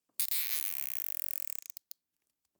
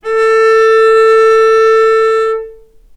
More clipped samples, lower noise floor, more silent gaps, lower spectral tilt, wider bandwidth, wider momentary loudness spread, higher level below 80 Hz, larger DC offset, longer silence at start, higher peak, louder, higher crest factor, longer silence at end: neither; first, -85 dBFS vs -36 dBFS; neither; second, 4.5 dB/octave vs -1 dB/octave; first, over 20 kHz vs 10.5 kHz; first, 20 LU vs 6 LU; second, under -90 dBFS vs -46 dBFS; neither; first, 0.2 s vs 0.05 s; second, -10 dBFS vs 0 dBFS; second, -32 LUFS vs -8 LUFS; first, 26 dB vs 8 dB; first, 1.2 s vs 0.45 s